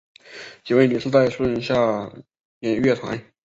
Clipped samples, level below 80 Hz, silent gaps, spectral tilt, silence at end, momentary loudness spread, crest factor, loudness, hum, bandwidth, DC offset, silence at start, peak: under 0.1%; -54 dBFS; 2.45-2.61 s; -7 dB/octave; 0.25 s; 19 LU; 18 dB; -21 LUFS; none; 8 kHz; under 0.1%; 0.3 s; -4 dBFS